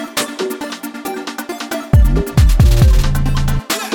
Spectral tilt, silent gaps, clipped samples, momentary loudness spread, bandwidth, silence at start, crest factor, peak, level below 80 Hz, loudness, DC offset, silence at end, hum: -5.5 dB/octave; none; under 0.1%; 13 LU; 19 kHz; 0 s; 12 dB; 0 dBFS; -16 dBFS; -16 LUFS; under 0.1%; 0 s; none